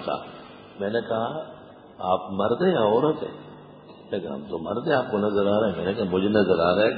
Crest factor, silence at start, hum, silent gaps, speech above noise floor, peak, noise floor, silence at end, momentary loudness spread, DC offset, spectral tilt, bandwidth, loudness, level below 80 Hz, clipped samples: 18 dB; 0 s; none; none; 22 dB; -6 dBFS; -46 dBFS; 0 s; 16 LU; under 0.1%; -11 dB/octave; 5 kHz; -24 LUFS; -56 dBFS; under 0.1%